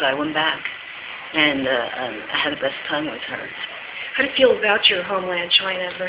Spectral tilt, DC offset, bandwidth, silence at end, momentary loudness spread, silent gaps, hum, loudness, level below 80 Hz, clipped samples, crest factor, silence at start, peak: -6.5 dB/octave; under 0.1%; 4 kHz; 0 s; 14 LU; none; none; -20 LUFS; -58 dBFS; under 0.1%; 20 dB; 0 s; -2 dBFS